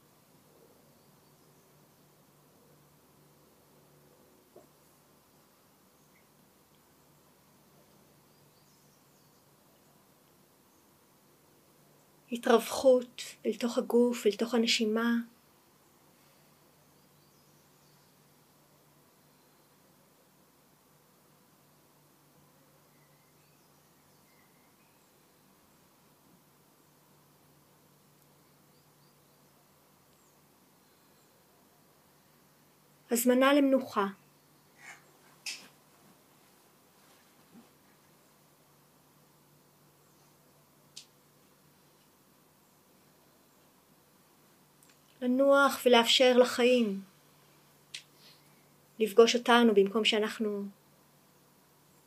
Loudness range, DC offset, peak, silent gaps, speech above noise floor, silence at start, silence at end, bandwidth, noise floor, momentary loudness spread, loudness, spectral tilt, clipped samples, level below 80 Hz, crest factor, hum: 17 LU; under 0.1%; -8 dBFS; none; 38 dB; 12.3 s; 1.35 s; 15.5 kHz; -64 dBFS; 24 LU; -27 LUFS; -3.5 dB/octave; under 0.1%; -84 dBFS; 28 dB; none